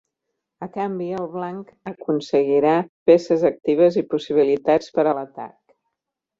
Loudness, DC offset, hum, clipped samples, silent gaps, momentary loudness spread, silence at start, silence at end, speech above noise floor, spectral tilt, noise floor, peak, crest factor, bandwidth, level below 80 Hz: -20 LUFS; under 0.1%; none; under 0.1%; 2.89-3.06 s; 17 LU; 0.6 s; 0.9 s; 63 dB; -7 dB/octave; -83 dBFS; -2 dBFS; 18 dB; 7.6 kHz; -64 dBFS